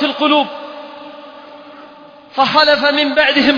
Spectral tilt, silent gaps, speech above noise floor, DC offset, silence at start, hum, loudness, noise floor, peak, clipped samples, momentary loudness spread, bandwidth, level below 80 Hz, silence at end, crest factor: -4 dB/octave; none; 27 dB; under 0.1%; 0 s; none; -12 LUFS; -39 dBFS; 0 dBFS; under 0.1%; 23 LU; 5.2 kHz; -54 dBFS; 0 s; 16 dB